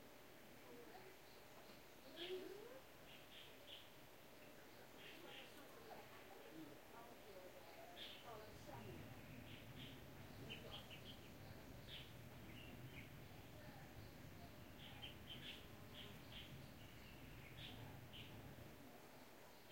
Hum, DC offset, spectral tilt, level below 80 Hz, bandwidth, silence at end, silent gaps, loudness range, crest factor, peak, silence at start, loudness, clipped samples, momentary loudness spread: none; under 0.1%; -4.5 dB/octave; -72 dBFS; 16.5 kHz; 0 s; none; 3 LU; 18 dB; -40 dBFS; 0 s; -58 LUFS; under 0.1%; 7 LU